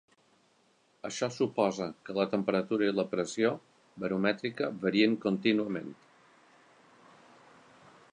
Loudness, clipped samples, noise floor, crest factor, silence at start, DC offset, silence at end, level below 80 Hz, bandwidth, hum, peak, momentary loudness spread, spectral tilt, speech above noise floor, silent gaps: -31 LUFS; under 0.1%; -68 dBFS; 22 dB; 1.05 s; under 0.1%; 2.2 s; -74 dBFS; 10 kHz; none; -12 dBFS; 12 LU; -5.5 dB/octave; 38 dB; none